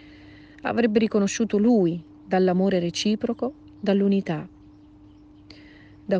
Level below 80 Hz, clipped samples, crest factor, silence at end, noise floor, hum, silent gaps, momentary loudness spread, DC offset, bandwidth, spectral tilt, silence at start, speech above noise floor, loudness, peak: -58 dBFS; under 0.1%; 16 dB; 0 s; -50 dBFS; none; none; 12 LU; under 0.1%; 9.8 kHz; -6 dB/octave; 0.65 s; 28 dB; -23 LUFS; -8 dBFS